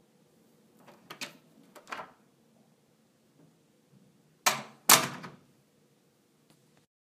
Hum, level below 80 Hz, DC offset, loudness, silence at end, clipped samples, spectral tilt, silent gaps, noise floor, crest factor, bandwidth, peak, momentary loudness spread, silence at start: none; -82 dBFS; under 0.1%; -26 LUFS; 1.75 s; under 0.1%; -0.5 dB/octave; none; -68 dBFS; 34 dB; 15.5 kHz; -2 dBFS; 28 LU; 1.1 s